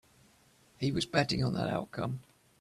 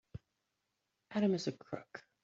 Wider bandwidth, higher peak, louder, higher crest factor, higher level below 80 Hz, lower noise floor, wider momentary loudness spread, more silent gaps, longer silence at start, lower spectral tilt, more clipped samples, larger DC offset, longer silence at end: first, 13 kHz vs 7.6 kHz; first, -14 dBFS vs -20 dBFS; first, -33 LUFS vs -38 LUFS; about the same, 20 dB vs 20 dB; first, -58 dBFS vs -72 dBFS; second, -65 dBFS vs -86 dBFS; second, 8 LU vs 21 LU; neither; first, 0.8 s vs 0.15 s; about the same, -5.5 dB/octave vs -6 dB/octave; neither; neither; first, 0.4 s vs 0.25 s